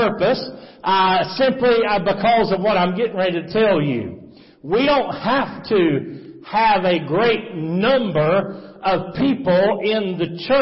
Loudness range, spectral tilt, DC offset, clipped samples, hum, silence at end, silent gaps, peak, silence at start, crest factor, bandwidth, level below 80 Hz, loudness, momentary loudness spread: 2 LU; -9.5 dB/octave; under 0.1%; under 0.1%; none; 0 s; none; -6 dBFS; 0 s; 12 dB; 5.8 kHz; -50 dBFS; -18 LUFS; 9 LU